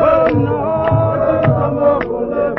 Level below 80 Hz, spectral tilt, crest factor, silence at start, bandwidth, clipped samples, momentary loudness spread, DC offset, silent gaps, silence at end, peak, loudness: -36 dBFS; -11 dB/octave; 12 dB; 0 s; 5.8 kHz; under 0.1%; 5 LU; under 0.1%; none; 0 s; -2 dBFS; -15 LUFS